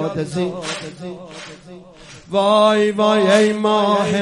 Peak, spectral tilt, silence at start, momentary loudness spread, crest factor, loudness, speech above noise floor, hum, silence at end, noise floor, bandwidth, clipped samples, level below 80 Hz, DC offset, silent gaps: 0 dBFS; -5 dB/octave; 0 s; 20 LU; 16 dB; -16 LUFS; 25 dB; none; 0 s; -41 dBFS; 11.5 kHz; under 0.1%; -56 dBFS; under 0.1%; none